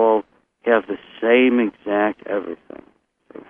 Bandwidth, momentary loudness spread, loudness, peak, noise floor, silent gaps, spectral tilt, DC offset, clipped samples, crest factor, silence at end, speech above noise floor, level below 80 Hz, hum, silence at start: 3.7 kHz; 15 LU; -19 LUFS; -2 dBFS; -46 dBFS; none; -8 dB/octave; under 0.1%; under 0.1%; 18 dB; 0.1 s; 27 dB; -64 dBFS; none; 0 s